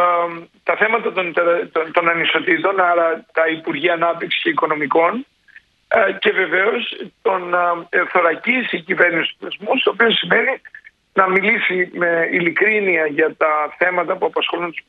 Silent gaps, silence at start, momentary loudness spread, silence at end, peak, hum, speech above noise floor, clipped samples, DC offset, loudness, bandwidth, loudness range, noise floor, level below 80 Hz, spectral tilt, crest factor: none; 0 s; 6 LU; 0.1 s; 0 dBFS; none; 31 dB; under 0.1%; under 0.1%; -17 LUFS; 5 kHz; 2 LU; -49 dBFS; -68 dBFS; -6.5 dB/octave; 18 dB